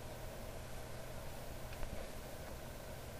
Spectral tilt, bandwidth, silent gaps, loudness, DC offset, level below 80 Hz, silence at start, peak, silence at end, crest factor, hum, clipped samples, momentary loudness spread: -4.5 dB/octave; 15.5 kHz; none; -49 LUFS; under 0.1%; -52 dBFS; 0 s; -26 dBFS; 0 s; 20 dB; none; under 0.1%; 2 LU